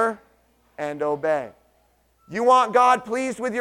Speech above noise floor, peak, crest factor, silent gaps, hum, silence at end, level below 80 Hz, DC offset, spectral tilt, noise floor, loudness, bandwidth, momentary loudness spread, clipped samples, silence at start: 42 dB; -6 dBFS; 18 dB; none; none; 0 s; -66 dBFS; under 0.1%; -4 dB/octave; -63 dBFS; -21 LUFS; 13.5 kHz; 16 LU; under 0.1%; 0 s